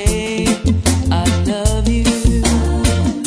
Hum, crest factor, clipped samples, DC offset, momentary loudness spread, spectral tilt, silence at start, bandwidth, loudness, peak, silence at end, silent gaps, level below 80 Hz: none; 14 dB; under 0.1%; under 0.1%; 2 LU; -5 dB/octave; 0 s; 11 kHz; -16 LUFS; -2 dBFS; 0 s; none; -20 dBFS